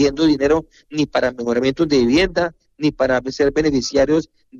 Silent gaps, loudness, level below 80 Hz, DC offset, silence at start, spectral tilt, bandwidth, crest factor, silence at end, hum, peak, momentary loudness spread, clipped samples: none; -18 LUFS; -40 dBFS; under 0.1%; 0 s; -5 dB/octave; 7.8 kHz; 12 dB; 0 s; none; -4 dBFS; 7 LU; under 0.1%